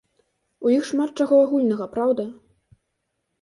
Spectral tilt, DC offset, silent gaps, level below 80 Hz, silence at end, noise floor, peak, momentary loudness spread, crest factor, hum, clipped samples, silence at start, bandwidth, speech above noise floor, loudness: -6 dB/octave; under 0.1%; none; -66 dBFS; 1.1 s; -76 dBFS; -8 dBFS; 9 LU; 16 dB; none; under 0.1%; 0.6 s; 11.5 kHz; 56 dB; -21 LUFS